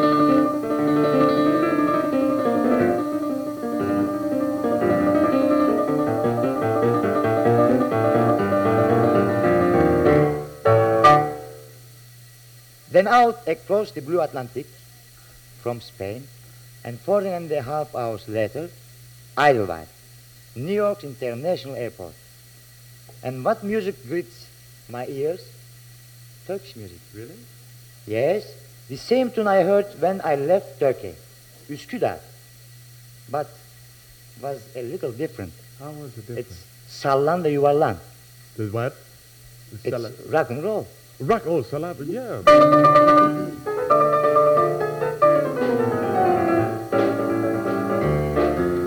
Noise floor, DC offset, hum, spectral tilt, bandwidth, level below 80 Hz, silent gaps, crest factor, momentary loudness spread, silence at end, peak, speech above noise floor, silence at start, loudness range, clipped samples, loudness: -47 dBFS; under 0.1%; none; -7 dB/octave; 19 kHz; -50 dBFS; none; 18 dB; 18 LU; 0 s; -4 dBFS; 25 dB; 0 s; 15 LU; under 0.1%; -20 LUFS